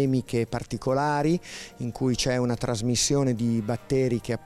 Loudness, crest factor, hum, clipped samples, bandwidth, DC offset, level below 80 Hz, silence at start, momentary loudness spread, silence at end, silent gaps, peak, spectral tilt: -26 LUFS; 12 dB; none; under 0.1%; 14.5 kHz; under 0.1%; -48 dBFS; 0 s; 7 LU; 0 s; none; -12 dBFS; -5 dB/octave